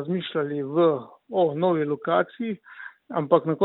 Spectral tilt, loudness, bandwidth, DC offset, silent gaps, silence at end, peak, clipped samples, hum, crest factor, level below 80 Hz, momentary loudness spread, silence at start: -11 dB/octave; -25 LUFS; 4.1 kHz; under 0.1%; none; 0 s; -4 dBFS; under 0.1%; none; 20 dB; -74 dBFS; 10 LU; 0 s